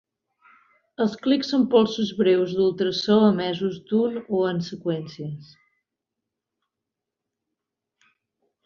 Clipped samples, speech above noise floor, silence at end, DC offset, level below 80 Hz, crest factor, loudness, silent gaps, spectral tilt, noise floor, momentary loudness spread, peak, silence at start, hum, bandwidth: under 0.1%; 63 dB; 3.2 s; under 0.1%; -66 dBFS; 18 dB; -22 LUFS; none; -6.5 dB/octave; -85 dBFS; 11 LU; -6 dBFS; 1 s; none; 7.2 kHz